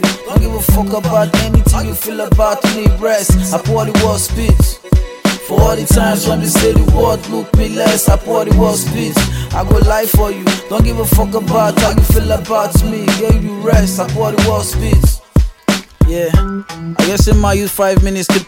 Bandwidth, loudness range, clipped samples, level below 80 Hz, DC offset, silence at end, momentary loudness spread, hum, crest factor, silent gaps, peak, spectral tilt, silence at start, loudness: 17 kHz; 1 LU; under 0.1%; -16 dBFS; under 0.1%; 0.05 s; 5 LU; none; 12 dB; none; 0 dBFS; -5.5 dB/octave; 0 s; -13 LUFS